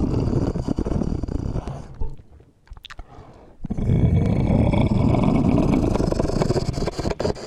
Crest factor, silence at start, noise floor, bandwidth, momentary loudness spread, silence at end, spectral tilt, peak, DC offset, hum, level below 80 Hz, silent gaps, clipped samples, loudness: 16 dB; 0 s; -49 dBFS; 11.5 kHz; 17 LU; 0 s; -8 dB/octave; -4 dBFS; under 0.1%; none; -30 dBFS; none; under 0.1%; -22 LUFS